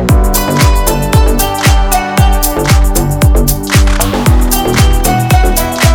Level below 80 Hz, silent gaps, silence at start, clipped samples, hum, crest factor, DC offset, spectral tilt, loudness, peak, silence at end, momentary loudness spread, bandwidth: -12 dBFS; none; 0 s; under 0.1%; none; 8 dB; under 0.1%; -4.5 dB/octave; -10 LUFS; 0 dBFS; 0 s; 2 LU; 20 kHz